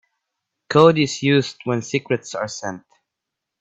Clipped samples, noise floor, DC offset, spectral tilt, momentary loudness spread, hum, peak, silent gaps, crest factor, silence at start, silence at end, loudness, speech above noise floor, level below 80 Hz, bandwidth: under 0.1%; -83 dBFS; under 0.1%; -5.5 dB/octave; 15 LU; none; 0 dBFS; none; 20 dB; 0.7 s; 0.8 s; -19 LUFS; 64 dB; -62 dBFS; 8.4 kHz